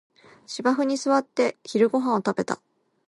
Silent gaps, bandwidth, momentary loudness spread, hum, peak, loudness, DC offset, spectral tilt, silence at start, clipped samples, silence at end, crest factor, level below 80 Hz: none; 11.5 kHz; 9 LU; none; -8 dBFS; -24 LUFS; under 0.1%; -5 dB/octave; 0.5 s; under 0.1%; 0.55 s; 18 dB; -74 dBFS